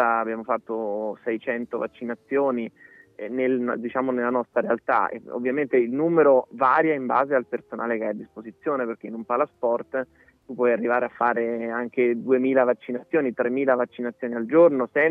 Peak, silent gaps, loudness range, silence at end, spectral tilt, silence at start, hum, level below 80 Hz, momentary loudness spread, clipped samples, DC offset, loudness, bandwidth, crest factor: -6 dBFS; none; 6 LU; 0 s; -9 dB/octave; 0 s; none; -74 dBFS; 11 LU; under 0.1%; under 0.1%; -24 LUFS; 4.3 kHz; 18 dB